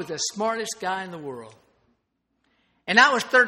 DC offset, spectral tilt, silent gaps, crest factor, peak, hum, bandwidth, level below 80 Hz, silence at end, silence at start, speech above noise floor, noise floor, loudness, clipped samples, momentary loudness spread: under 0.1%; -2 dB/octave; none; 24 dB; 0 dBFS; none; 16 kHz; -72 dBFS; 0 s; 0 s; 52 dB; -75 dBFS; -22 LUFS; under 0.1%; 21 LU